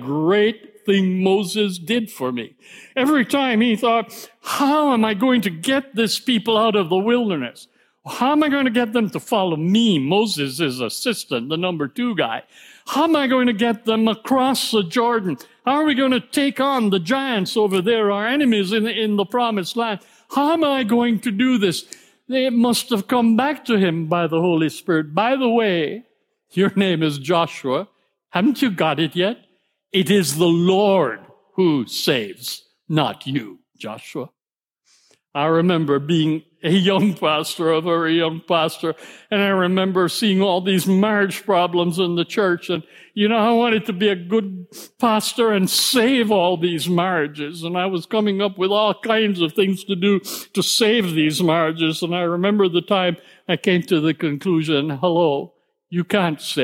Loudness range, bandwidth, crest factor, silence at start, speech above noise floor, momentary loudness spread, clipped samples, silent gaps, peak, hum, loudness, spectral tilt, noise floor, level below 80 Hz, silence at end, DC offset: 2 LU; 16.5 kHz; 16 dB; 0 s; over 71 dB; 9 LU; under 0.1%; none; -4 dBFS; none; -19 LUFS; -5 dB/octave; under -90 dBFS; -70 dBFS; 0 s; under 0.1%